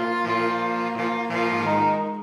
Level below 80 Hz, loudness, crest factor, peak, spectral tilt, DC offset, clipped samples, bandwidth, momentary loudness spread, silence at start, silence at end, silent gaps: -72 dBFS; -23 LUFS; 14 dB; -10 dBFS; -6 dB/octave; under 0.1%; under 0.1%; 12 kHz; 4 LU; 0 s; 0 s; none